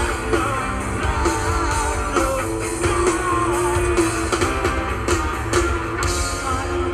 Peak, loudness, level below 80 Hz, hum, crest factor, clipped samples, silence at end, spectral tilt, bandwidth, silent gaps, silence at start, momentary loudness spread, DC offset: -4 dBFS; -21 LUFS; -28 dBFS; none; 16 dB; under 0.1%; 0 s; -4.5 dB/octave; 14.5 kHz; none; 0 s; 4 LU; under 0.1%